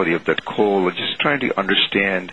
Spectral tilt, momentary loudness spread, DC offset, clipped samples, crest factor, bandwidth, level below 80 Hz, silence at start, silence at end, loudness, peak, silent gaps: -6 dB/octave; 4 LU; 0.3%; under 0.1%; 18 dB; 9.6 kHz; -56 dBFS; 0 s; 0 s; -18 LUFS; -2 dBFS; none